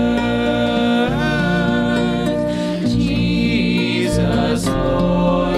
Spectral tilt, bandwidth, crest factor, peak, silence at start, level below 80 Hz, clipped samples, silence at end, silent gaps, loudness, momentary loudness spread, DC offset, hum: -6.5 dB/octave; 13 kHz; 12 dB; -6 dBFS; 0 s; -32 dBFS; under 0.1%; 0 s; none; -17 LUFS; 2 LU; under 0.1%; none